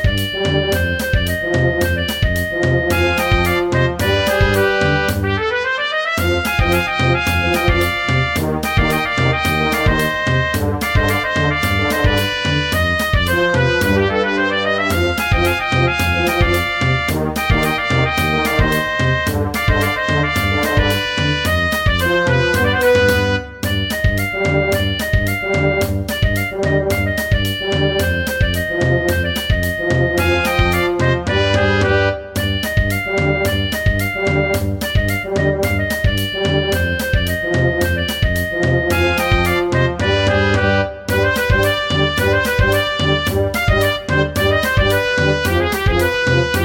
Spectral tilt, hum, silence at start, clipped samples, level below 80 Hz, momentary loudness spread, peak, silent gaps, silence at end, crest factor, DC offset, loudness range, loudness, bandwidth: -5 dB/octave; none; 0 s; under 0.1%; -26 dBFS; 3 LU; 0 dBFS; none; 0 s; 16 dB; under 0.1%; 2 LU; -16 LUFS; 17 kHz